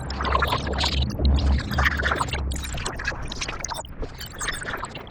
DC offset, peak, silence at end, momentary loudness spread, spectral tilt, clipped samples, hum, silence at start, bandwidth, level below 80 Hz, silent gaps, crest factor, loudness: under 0.1%; -6 dBFS; 0 s; 10 LU; -4 dB/octave; under 0.1%; none; 0 s; 18.5 kHz; -28 dBFS; none; 20 dB; -26 LUFS